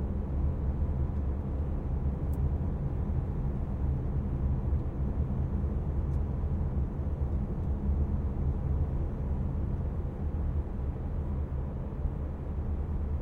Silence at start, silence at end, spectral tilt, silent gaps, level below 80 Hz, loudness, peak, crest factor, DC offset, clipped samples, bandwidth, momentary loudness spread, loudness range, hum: 0 s; 0 s; -11 dB/octave; none; -34 dBFS; -33 LUFS; -18 dBFS; 12 dB; under 0.1%; under 0.1%; 2.9 kHz; 4 LU; 2 LU; none